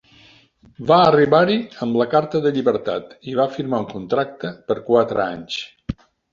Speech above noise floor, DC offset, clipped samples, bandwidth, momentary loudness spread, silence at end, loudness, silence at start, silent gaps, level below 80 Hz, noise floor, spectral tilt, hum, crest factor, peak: 33 dB; under 0.1%; under 0.1%; 7.4 kHz; 14 LU; 0.4 s; -19 LUFS; 0.8 s; none; -52 dBFS; -51 dBFS; -7 dB/octave; none; 18 dB; -2 dBFS